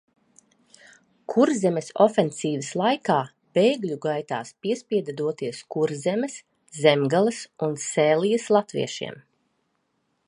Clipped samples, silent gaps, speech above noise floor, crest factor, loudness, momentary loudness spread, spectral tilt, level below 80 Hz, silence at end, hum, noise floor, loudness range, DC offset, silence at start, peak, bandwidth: under 0.1%; none; 50 dB; 22 dB; -24 LUFS; 10 LU; -5 dB/octave; -74 dBFS; 1.1 s; none; -73 dBFS; 3 LU; under 0.1%; 1.3 s; -2 dBFS; 11 kHz